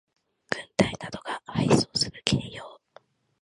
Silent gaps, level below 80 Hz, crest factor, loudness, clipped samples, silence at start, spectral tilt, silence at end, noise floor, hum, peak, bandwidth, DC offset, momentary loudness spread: none; -52 dBFS; 26 dB; -27 LUFS; under 0.1%; 0.5 s; -4.5 dB/octave; 0.65 s; -57 dBFS; none; -2 dBFS; 11.5 kHz; under 0.1%; 16 LU